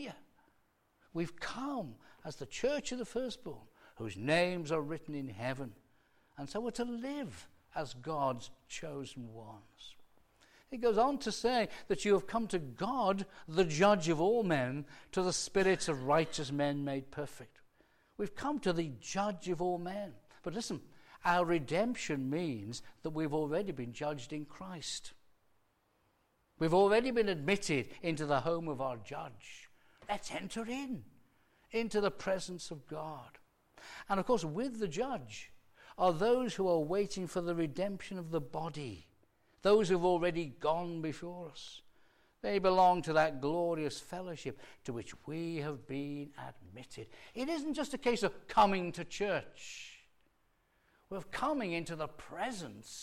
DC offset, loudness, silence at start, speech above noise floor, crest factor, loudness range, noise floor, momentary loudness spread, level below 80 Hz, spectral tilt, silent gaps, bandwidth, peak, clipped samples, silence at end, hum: under 0.1%; -35 LUFS; 0 s; 40 dB; 20 dB; 8 LU; -75 dBFS; 18 LU; -62 dBFS; -5 dB/octave; none; 16 kHz; -16 dBFS; under 0.1%; 0 s; none